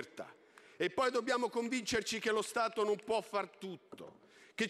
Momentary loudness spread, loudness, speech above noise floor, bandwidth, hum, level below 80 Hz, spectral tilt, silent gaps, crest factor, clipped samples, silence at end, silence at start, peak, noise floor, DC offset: 17 LU; -35 LUFS; 25 dB; 14.5 kHz; none; -72 dBFS; -3 dB/octave; none; 16 dB; under 0.1%; 0 s; 0 s; -22 dBFS; -61 dBFS; under 0.1%